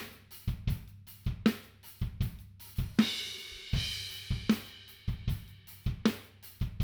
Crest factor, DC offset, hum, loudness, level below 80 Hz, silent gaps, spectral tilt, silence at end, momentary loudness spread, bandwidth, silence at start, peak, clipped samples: 22 dB; under 0.1%; none; -35 LUFS; -44 dBFS; none; -5.5 dB/octave; 0 s; 14 LU; over 20 kHz; 0 s; -12 dBFS; under 0.1%